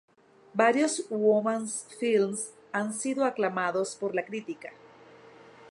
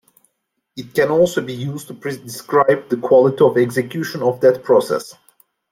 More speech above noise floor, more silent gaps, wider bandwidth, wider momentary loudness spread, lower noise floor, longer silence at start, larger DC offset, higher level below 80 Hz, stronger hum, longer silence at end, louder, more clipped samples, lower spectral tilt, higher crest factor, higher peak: second, 25 dB vs 56 dB; neither; second, 11.5 kHz vs 16 kHz; about the same, 12 LU vs 14 LU; second, -53 dBFS vs -73 dBFS; second, 0.55 s vs 0.75 s; neither; second, -80 dBFS vs -60 dBFS; neither; second, 0 s vs 0.6 s; second, -28 LUFS vs -17 LUFS; neither; second, -4 dB/octave vs -6 dB/octave; about the same, 20 dB vs 16 dB; second, -8 dBFS vs -2 dBFS